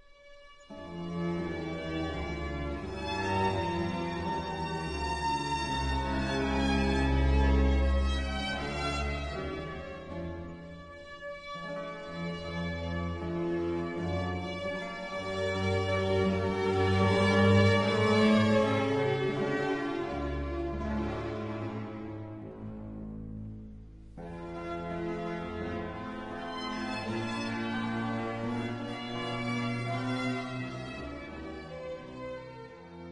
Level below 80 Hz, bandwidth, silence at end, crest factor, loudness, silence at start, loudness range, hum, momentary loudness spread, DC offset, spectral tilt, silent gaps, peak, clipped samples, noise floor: -40 dBFS; 11 kHz; 0 s; 22 dB; -32 LUFS; 0.2 s; 13 LU; none; 16 LU; under 0.1%; -6.5 dB/octave; none; -10 dBFS; under 0.1%; -53 dBFS